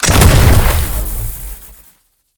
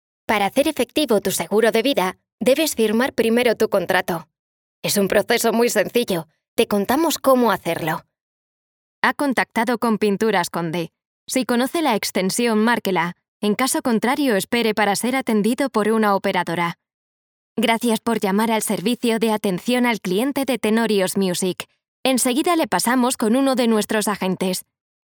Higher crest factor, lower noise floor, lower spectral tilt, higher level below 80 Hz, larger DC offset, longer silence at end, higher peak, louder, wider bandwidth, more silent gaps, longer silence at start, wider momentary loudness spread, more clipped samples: second, 12 dB vs 20 dB; second, -52 dBFS vs under -90 dBFS; about the same, -4.5 dB/octave vs -4 dB/octave; first, -16 dBFS vs -60 dBFS; neither; first, 0.7 s vs 0.45 s; about the same, 0 dBFS vs 0 dBFS; first, -12 LUFS vs -20 LUFS; about the same, over 20 kHz vs over 20 kHz; second, none vs 2.32-2.38 s, 4.39-4.82 s, 6.48-6.57 s, 8.21-9.02 s, 11.07-11.26 s, 13.28-13.40 s, 16.94-17.56 s, 21.88-22.04 s; second, 0 s vs 0.3 s; first, 20 LU vs 7 LU; first, 0.5% vs under 0.1%